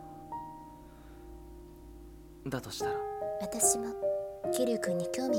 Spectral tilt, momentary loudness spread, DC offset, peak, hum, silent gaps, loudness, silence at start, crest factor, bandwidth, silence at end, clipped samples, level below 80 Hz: -3.5 dB/octave; 24 LU; under 0.1%; -14 dBFS; none; none; -33 LUFS; 0 s; 22 dB; 17.5 kHz; 0 s; under 0.1%; -56 dBFS